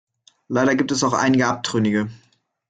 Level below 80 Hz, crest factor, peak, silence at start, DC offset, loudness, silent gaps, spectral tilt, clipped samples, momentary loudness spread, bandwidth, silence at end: -58 dBFS; 16 dB; -4 dBFS; 0.5 s; under 0.1%; -20 LUFS; none; -4.5 dB/octave; under 0.1%; 7 LU; 9.2 kHz; 0.55 s